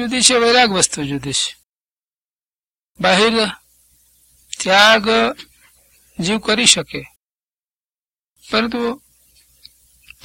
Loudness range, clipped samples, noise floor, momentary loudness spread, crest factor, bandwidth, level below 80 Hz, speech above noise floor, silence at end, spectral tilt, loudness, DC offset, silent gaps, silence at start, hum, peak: 5 LU; under 0.1%; under -90 dBFS; 19 LU; 18 dB; 16.5 kHz; -52 dBFS; over 75 dB; 1.25 s; -2 dB/octave; -15 LUFS; under 0.1%; 1.66-1.97 s, 2.04-2.09 s, 2.16-2.64 s, 2.71-2.95 s, 7.16-7.68 s, 7.75-8.25 s, 8.31-8.36 s; 0 s; none; 0 dBFS